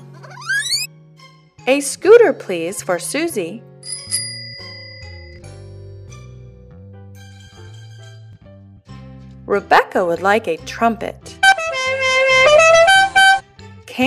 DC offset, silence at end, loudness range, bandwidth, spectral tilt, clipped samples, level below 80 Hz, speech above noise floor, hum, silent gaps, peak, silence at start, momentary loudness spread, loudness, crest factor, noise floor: under 0.1%; 0 s; 19 LU; 15 kHz; -2.5 dB/octave; under 0.1%; -50 dBFS; 30 dB; none; none; 0 dBFS; 0.25 s; 24 LU; -14 LUFS; 18 dB; -46 dBFS